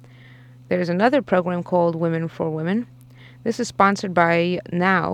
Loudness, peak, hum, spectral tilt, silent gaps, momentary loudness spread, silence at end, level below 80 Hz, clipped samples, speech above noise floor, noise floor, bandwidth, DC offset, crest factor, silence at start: -21 LUFS; -2 dBFS; none; -6.5 dB/octave; none; 8 LU; 0 s; -60 dBFS; under 0.1%; 25 dB; -45 dBFS; 10.5 kHz; under 0.1%; 18 dB; 0.7 s